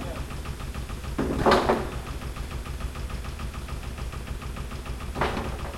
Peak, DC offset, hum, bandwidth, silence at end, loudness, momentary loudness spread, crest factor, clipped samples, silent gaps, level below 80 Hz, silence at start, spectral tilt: -6 dBFS; under 0.1%; none; 16.5 kHz; 0 s; -30 LUFS; 14 LU; 24 dB; under 0.1%; none; -36 dBFS; 0 s; -5.5 dB/octave